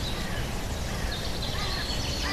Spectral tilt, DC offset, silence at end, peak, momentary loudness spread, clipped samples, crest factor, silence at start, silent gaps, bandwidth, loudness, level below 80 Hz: -3.5 dB/octave; under 0.1%; 0 s; -16 dBFS; 3 LU; under 0.1%; 12 dB; 0 s; none; 14 kHz; -31 LUFS; -34 dBFS